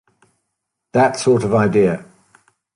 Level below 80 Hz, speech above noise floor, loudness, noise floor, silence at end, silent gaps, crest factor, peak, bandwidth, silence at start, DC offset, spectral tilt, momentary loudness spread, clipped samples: -52 dBFS; 62 dB; -16 LUFS; -77 dBFS; 0.7 s; none; 16 dB; -2 dBFS; 11 kHz; 0.95 s; under 0.1%; -6 dB/octave; 6 LU; under 0.1%